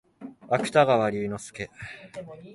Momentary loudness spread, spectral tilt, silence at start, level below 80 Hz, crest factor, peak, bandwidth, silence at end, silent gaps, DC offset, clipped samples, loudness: 21 LU; -5.5 dB/octave; 0.2 s; -60 dBFS; 20 dB; -6 dBFS; 11.5 kHz; 0 s; none; under 0.1%; under 0.1%; -24 LUFS